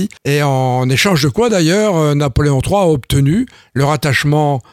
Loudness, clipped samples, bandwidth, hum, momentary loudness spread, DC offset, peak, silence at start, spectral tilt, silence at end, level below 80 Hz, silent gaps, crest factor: -13 LUFS; under 0.1%; 15.5 kHz; none; 4 LU; under 0.1%; 0 dBFS; 0 s; -5.5 dB/octave; 0.1 s; -34 dBFS; none; 12 dB